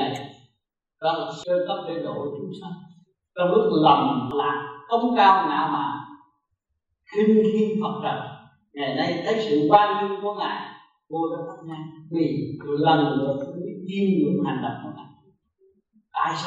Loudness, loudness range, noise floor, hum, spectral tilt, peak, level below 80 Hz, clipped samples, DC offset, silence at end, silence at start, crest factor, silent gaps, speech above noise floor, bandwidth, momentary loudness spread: -23 LUFS; 6 LU; -77 dBFS; none; -7 dB/octave; -2 dBFS; -66 dBFS; under 0.1%; under 0.1%; 0 s; 0 s; 22 dB; none; 55 dB; 8.2 kHz; 19 LU